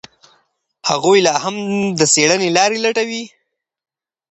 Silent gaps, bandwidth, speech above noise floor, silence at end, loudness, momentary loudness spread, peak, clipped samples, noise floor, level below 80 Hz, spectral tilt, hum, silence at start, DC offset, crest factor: none; 9 kHz; 47 dB; 1.05 s; -15 LUFS; 11 LU; 0 dBFS; under 0.1%; -62 dBFS; -62 dBFS; -2.5 dB/octave; none; 0.85 s; under 0.1%; 18 dB